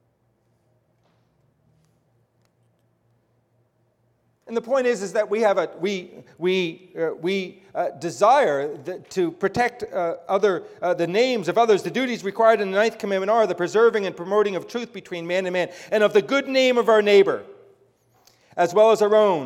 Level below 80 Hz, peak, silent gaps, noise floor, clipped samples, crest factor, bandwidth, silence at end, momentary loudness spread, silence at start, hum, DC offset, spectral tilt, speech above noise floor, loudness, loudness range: -68 dBFS; -4 dBFS; none; -66 dBFS; under 0.1%; 18 dB; 14 kHz; 0 s; 12 LU; 4.45 s; none; under 0.1%; -4.5 dB/octave; 45 dB; -21 LUFS; 5 LU